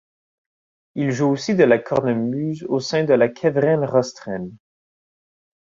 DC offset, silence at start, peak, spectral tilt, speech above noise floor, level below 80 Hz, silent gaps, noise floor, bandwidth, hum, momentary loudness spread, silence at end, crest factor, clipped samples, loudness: under 0.1%; 0.95 s; -2 dBFS; -6.5 dB/octave; over 71 dB; -60 dBFS; none; under -90 dBFS; 7.6 kHz; none; 14 LU; 1.05 s; 18 dB; under 0.1%; -20 LUFS